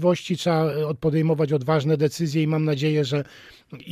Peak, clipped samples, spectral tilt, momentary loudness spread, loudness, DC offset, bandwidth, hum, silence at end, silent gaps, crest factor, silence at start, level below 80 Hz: -8 dBFS; under 0.1%; -7 dB/octave; 4 LU; -23 LUFS; under 0.1%; 15 kHz; none; 0 s; none; 14 dB; 0 s; -60 dBFS